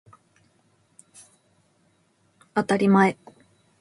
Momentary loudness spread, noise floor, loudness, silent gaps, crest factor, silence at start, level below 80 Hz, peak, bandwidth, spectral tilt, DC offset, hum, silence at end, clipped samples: 12 LU; -65 dBFS; -21 LUFS; none; 22 dB; 2.55 s; -70 dBFS; -4 dBFS; 11.5 kHz; -7 dB/octave; under 0.1%; none; 0.65 s; under 0.1%